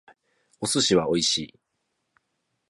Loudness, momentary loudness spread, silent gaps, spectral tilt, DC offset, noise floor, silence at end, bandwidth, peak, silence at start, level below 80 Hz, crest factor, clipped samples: -23 LUFS; 11 LU; none; -3 dB/octave; under 0.1%; -77 dBFS; 1.25 s; 11.5 kHz; -8 dBFS; 0.6 s; -60 dBFS; 20 dB; under 0.1%